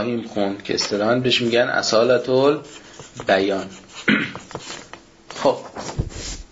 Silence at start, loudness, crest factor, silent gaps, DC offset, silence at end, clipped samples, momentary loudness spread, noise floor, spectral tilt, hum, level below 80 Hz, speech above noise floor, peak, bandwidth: 0 s; -20 LUFS; 18 dB; none; under 0.1%; 0.05 s; under 0.1%; 17 LU; -42 dBFS; -4 dB/octave; none; -42 dBFS; 21 dB; -4 dBFS; 8 kHz